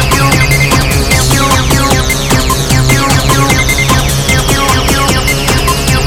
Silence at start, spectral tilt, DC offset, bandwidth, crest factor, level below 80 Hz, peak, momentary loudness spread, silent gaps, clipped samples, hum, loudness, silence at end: 0 s; -3.5 dB/octave; under 0.1%; 18 kHz; 8 dB; -16 dBFS; 0 dBFS; 2 LU; none; 0.3%; none; -9 LUFS; 0 s